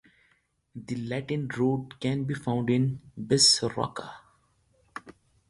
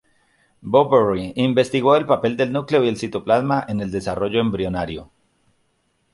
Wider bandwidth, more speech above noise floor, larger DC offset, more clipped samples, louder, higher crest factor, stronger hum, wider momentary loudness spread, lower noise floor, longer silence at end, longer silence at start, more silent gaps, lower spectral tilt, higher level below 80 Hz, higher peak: about the same, 11.5 kHz vs 11.5 kHz; second, 42 dB vs 48 dB; neither; neither; second, -26 LUFS vs -19 LUFS; about the same, 22 dB vs 18 dB; neither; first, 25 LU vs 9 LU; about the same, -69 dBFS vs -67 dBFS; second, 0.4 s vs 1.1 s; about the same, 0.75 s vs 0.65 s; neither; second, -4 dB/octave vs -6.5 dB/octave; second, -62 dBFS vs -48 dBFS; second, -8 dBFS vs -2 dBFS